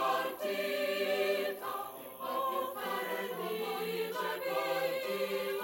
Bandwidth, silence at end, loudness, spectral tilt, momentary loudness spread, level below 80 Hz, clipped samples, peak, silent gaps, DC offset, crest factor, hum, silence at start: 16.5 kHz; 0 s; -35 LUFS; -3 dB/octave; 6 LU; -78 dBFS; under 0.1%; -20 dBFS; none; under 0.1%; 16 dB; none; 0 s